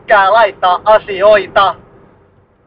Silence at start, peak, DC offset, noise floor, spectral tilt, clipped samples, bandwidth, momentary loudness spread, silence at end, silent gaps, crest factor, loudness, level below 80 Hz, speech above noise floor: 0.1 s; 0 dBFS; under 0.1%; -49 dBFS; -6 dB/octave; under 0.1%; 5.2 kHz; 5 LU; 0.95 s; none; 12 dB; -10 LUFS; -44 dBFS; 39 dB